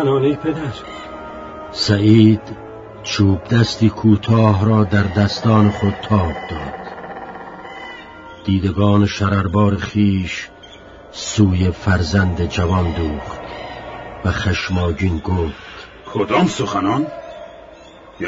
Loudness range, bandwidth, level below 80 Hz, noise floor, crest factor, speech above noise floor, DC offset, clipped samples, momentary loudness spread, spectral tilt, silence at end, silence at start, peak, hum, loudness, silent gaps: 6 LU; 7.8 kHz; -36 dBFS; -41 dBFS; 18 dB; 25 dB; under 0.1%; under 0.1%; 19 LU; -6.5 dB/octave; 0 s; 0 s; 0 dBFS; none; -17 LUFS; none